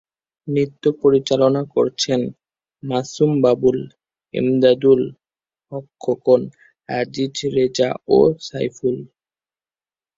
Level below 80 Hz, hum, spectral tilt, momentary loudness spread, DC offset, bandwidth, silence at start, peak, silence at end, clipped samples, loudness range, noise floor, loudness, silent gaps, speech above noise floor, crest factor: -58 dBFS; none; -6 dB/octave; 14 LU; under 0.1%; 7.8 kHz; 0.45 s; -2 dBFS; 1.1 s; under 0.1%; 2 LU; under -90 dBFS; -19 LUFS; none; over 72 dB; 18 dB